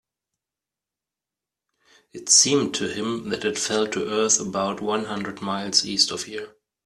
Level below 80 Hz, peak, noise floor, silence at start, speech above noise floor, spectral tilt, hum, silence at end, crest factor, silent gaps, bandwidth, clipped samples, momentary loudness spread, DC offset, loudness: -64 dBFS; -2 dBFS; -89 dBFS; 2.15 s; 65 dB; -2 dB/octave; none; 0.35 s; 22 dB; none; 13 kHz; under 0.1%; 15 LU; under 0.1%; -21 LUFS